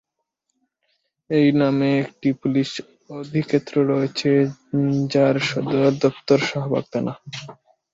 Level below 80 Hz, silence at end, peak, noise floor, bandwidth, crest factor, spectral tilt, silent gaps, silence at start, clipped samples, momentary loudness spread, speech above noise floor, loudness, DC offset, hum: -62 dBFS; 0.4 s; -2 dBFS; -77 dBFS; 7.8 kHz; 18 dB; -6.5 dB/octave; none; 1.3 s; under 0.1%; 10 LU; 57 dB; -21 LUFS; under 0.1%; none